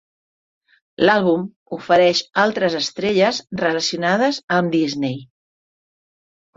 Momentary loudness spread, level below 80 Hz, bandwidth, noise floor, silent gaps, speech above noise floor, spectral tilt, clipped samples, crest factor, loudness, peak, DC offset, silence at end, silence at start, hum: 9 LU; -62 dBFS; 7.8 kHz; under -90 dBFS; 1.56-1.66 s, 4.43-4.48 s; over 72 dB; -4.5 dB/octave; under 0.1%; 18 dB; -18 LUFS; -2 dBFS; under 0.1%; 1.3 s; 1 s; none